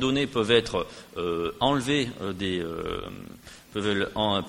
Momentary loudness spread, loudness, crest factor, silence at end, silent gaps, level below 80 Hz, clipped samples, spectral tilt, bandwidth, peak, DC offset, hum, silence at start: 14 LU; -27 LUFS; 20 dB; 0 s; none; -50 dBFS; under 0.1%; -5 dB/octave; 16.5 kHz; -8 dBFS; under 0.1%; none; 0 s